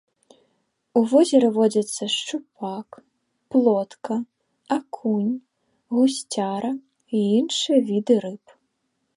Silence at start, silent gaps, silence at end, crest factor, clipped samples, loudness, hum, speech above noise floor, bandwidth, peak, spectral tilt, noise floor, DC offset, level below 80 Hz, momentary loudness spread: 0.95 s; none; 0.8 s; 18 dB; under 0.1%; -22 LUFS; none; 53 dB; 11.5 kHz; -6 dBFS; -5 dB/octave; -74 dBFS; under 0.1%; -76 dBFS; 14 LU